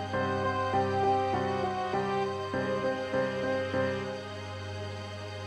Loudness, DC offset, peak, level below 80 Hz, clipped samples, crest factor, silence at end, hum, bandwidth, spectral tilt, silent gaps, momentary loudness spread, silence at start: -31 LUFS; under 0.1%; -16 dBFS; -62 dBFS; under 0.1%; 14 dB; 0 s; none; 11.5 kHz; -6 dB/octave; none; 11 LU; 0 s